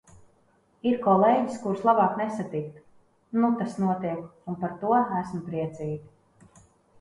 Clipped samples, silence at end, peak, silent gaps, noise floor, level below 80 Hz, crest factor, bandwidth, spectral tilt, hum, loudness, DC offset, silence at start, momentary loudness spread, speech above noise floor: under 0.1%; 0.95 s; -8 dBFS; none; -64 dBFS; -64 dBFS; 20 dB; 11 kHz; -8 dB/octave; none; -26 LUFS; under 0.1%; 0.85 s; 13 LU; 39 dB